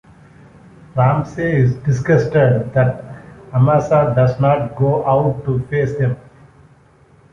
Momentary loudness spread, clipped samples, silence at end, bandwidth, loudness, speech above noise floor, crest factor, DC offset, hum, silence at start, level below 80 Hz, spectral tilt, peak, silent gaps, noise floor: 8 LU; under 0.1%; 1.1 s; 7 kHz; -16 LUFS; 35 dB; 14 dB; under 0.1%; none; 0.95 s; -44 dBFS; -9 dB/octave; -2 dBFS; none; -49 dBFS